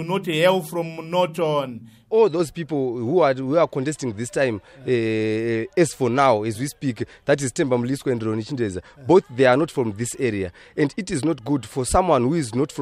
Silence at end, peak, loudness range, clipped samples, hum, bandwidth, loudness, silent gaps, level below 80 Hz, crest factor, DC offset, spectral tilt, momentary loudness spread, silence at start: 0 s; -4 dBFS; 1 LU; under 0.1%; none; 15.5 kHz; -22 LUFS; none; -46 dBFS; 18 dB; under 0.1%; -5.5 dB/octave; 9 LU; 0 s